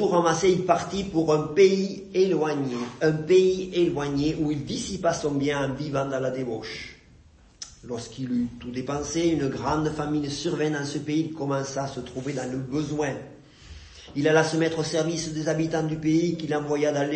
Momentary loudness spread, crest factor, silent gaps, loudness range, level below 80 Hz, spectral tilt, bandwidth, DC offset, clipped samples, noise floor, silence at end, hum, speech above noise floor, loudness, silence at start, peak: 12 LU; 18 dB; none; 7 LU; -52 dBFS; -5.5 dB/octave; 8.8 kHz; under 0.1%; under 0.1%; -54 dBFS; 0 s; none; 29 dB; -25 LUFS; 0 s; -6 dBFS